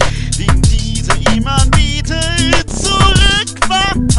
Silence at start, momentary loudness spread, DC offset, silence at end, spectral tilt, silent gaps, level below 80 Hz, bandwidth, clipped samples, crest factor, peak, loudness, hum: 0 s; 6 LU; under 0.1%; 0 s; -4 dB/octave; none; -16 dBFS; 11.5 kHz; under 0.1%; 12 dB; 0 dBFS; -13 LUFS; none